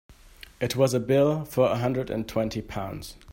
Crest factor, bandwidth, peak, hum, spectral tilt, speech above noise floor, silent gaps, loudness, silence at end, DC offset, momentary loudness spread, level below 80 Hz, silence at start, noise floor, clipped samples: 18 dB; 16.5 kHz; -8 dBFS; none; -6 dB/octave; 24 dB; none; -26 LUFS; 0 s; under 0.1%; 12 LU; -50 dBFS; 0.1 s; -49 dBFS; under 0.1%